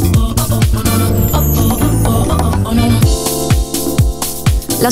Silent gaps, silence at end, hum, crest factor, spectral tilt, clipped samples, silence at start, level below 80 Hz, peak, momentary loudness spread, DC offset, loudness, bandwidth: none; 0 s; none; 12 dB; -5.5 dB/octave; under 0.1%; 0 s; -18 dBFS; 0 dBFS; 3 LU; under 0.1%; -13 LUFS; 16.5 kHz